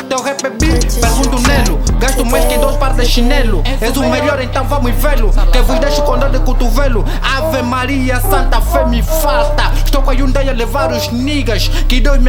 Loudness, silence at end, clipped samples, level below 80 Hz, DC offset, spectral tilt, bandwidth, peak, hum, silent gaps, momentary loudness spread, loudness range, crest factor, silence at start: -14 LUFS; 0 s; under 0.1%; -12 dBFS; under 0.1%; -4.5 dB/octave; 17.5 kHz; 0 dBFS; none; none; 3 LU; 1 LU; 10 dB; 0 s